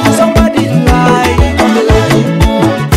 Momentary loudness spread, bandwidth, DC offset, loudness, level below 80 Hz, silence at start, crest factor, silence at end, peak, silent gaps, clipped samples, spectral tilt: 2 LU; 16 kHz; under 0.1%; -9 LUFS; -18 dBFS; 0 s; 8 dB; 0 s; 0 dBFS; none; 0.2%; -6 dB/octave